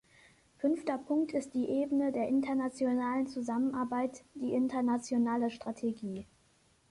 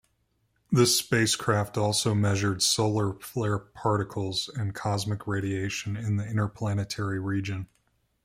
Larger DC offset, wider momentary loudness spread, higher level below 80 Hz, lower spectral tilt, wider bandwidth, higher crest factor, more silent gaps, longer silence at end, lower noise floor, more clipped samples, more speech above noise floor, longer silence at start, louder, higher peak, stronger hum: neither; about the same, 6 LU vs 8 LU; second, -70 dBFS vs -60 dBFS; first, -6 dB/octave vs -4.5 dB/octave; second, 11.5 kHz vs 16 kHz; second, 14 dB vs 20 dB; neither; about the same, 0.65 s vs 0.6 s; second, -68 dBFS vs -72 dBFS; neither; second, 36 dB vs 45 dB; about the same, 0.6 s vs 0.7 s; second, -33 LUFS vs -27 LUFS; second, -20 dBFS vs -8 dBFS; neither